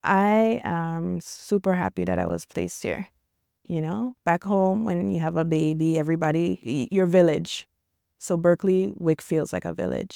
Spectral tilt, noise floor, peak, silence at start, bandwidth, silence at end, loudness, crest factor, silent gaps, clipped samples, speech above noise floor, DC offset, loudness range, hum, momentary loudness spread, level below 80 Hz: -6.5 dB/octave; -74 dBFS; -6 dBFS; 0.05 s; 16 kHz; 0 s; -24 LUFS; 18 dB; none; under 0.1%; 51 dB; under 0.1%; 5 LU; none; 10 LU; -56 dBFS